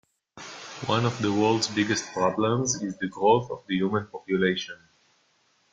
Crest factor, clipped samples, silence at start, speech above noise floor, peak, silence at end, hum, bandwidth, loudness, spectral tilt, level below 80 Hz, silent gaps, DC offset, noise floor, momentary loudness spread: 20 dB; under 0.1%; 0.35 s; 41 dB; -8 dBFS; 0.95 s; none; 9.6 kHz; -26 LUFS; -4.5 dB/octave; -64 dBFS; none; under 0.1%; -67 dBFS; 16 LU